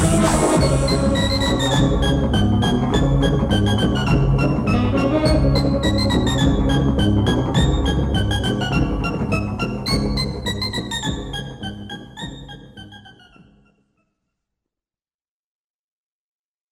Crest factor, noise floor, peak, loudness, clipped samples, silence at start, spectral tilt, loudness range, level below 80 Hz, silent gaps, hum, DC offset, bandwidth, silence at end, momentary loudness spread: 16 dB; under -90 dBFS; -4 dBFS; -19 LUFS; under 0.1%; 0 s; -5.5 dB/octave; 13 LU; -26 dBFS; none; none; under 0.1%; 15.5 kHz; 3.65 s; 14 LU